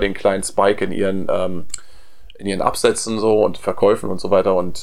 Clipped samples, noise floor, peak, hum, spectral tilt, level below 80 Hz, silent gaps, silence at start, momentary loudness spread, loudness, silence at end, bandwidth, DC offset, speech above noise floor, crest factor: under 0.1%; -44 dBFS; 0 dBFS; none; -4.5 dB/octave; -42 dBFS; none; 0 s; 10 LU; -18 LUFS; 0 s; 16 kHz; 4%; 26 dB; 18 dB